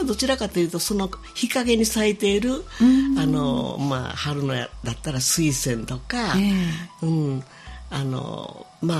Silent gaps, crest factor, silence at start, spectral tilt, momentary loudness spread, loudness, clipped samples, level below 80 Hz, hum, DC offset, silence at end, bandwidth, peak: none; 16 dB; 0 s; -4.5 dB/octave; 11 LU; -23 LUFS; under 0.1%; -42 dBFS; none; under 0.1%; 0 s; 15 kHz; -6 dBFS